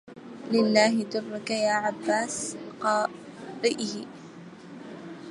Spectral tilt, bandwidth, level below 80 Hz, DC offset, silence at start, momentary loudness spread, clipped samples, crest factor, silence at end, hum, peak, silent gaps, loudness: -3.5 dB/octave; 11.5 kHz; -74 dBFS; under 0.1%; 0.05 s; 22 LU; under 0.1%; 20 dB; 0 s; none; -8 dBFS; none; -26 LUFS